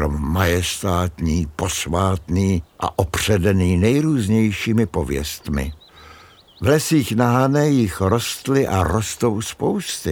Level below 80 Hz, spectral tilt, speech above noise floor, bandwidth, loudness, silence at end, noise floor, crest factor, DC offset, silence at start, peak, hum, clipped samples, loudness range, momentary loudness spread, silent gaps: -36 dBFS; -5.5 dB/octave; 27 dB; 18 kHz; -19 LUFS; 0 s; -46 dBFS; 18 dB; under 0.1%; 0 s; -2 dBFS; none; under 0.1%; 2 LU; 7 LU; none